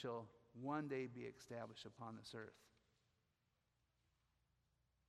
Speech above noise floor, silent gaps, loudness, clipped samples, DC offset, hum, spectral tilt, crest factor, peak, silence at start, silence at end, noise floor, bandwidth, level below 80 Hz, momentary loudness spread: 36 dB; none; -51 LUFS; under 0.1%; under 0.1%; none; -6 dB/octave; 22 dB; -32 dBFS; 0 s; 2.4 s; -86 dBFS; 13.5 kHz; -86 dBFS; 11 LU